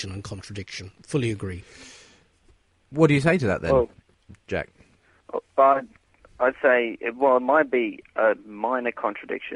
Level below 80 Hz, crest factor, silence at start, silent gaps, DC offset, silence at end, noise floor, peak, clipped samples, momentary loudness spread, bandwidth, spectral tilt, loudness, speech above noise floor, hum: -52 dBFS; 20 dB; 0 s; none; under 0.1%; 0 s; -60 dBFS; -4 dBFS; under 0.1%; 17 LU; 11.5 kHz; -6.5 dB/octave; -23 LUFS; 37 dB; none